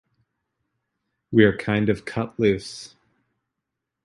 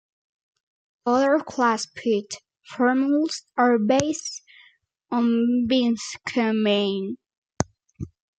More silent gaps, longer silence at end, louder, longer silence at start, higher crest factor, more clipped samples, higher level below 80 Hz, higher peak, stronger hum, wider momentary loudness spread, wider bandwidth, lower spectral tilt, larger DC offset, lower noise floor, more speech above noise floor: second, none vs 7.37-7.42 s; first, 1.2 s vs 0.35 s; about the same, -22 LUFS vs -23 LUFS; first, 1.3 s vs 1.05 s; about the same, 22 dB vs 22 dB; neither; first, -52 dBFS vs -58 dBFS; about the same, -2 dBFS vs -2 dBFS; neither; second, 13 LU vs 18 LU; first, 11.5 kHz vs 9.2 kHz; first, -6.5 dB/octave vs -4.5 dB/octave; neither; first, -83 dBFS vs -59 dBFS; first, 62 dB vs 37 dB